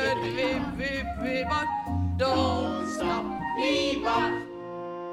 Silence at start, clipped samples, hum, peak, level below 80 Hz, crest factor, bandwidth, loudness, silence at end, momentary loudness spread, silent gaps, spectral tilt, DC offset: 0 s; under 0.1%; none; -12 dBFS; -46 dBFS; 16 dB; 14 kHz; -28 LUFS; 0 s; 7 LU; none; -5.5 dB/octave; under 0.1%